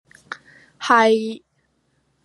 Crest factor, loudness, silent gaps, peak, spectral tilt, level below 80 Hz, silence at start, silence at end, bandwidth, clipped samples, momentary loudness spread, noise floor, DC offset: 20 dB; -18 LUFS; none; -2 dBFS; -3.5 dB/octave; -74 dBFS; 0.3 s; 0.9 s; 11.5 kHz; under 0.1%; 22 LU; -67 dBFS; under 0.1%